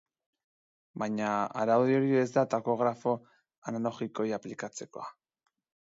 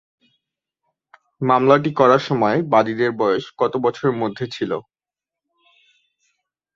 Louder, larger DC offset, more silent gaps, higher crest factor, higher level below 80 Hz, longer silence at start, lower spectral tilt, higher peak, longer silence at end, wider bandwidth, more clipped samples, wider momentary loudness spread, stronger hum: second, -30 LUFS vs -19 LUFS; neither; first, 3.58-3.62 s vs none; about the same, 18 dB vs 20 dB; second, -78 dBFS vs -62 dBFS; second, 0.95 s vs 1.4 s; about the same, -6.5 dB/octave vs -7 dB/octave; second, -14 dBFS vs -2 dBFS; second, 0.8 s vs 1.95 s; about the same, 7.8 kHz vs 7.4 kHz; neither; first, 17 LU vs 11 LU; neither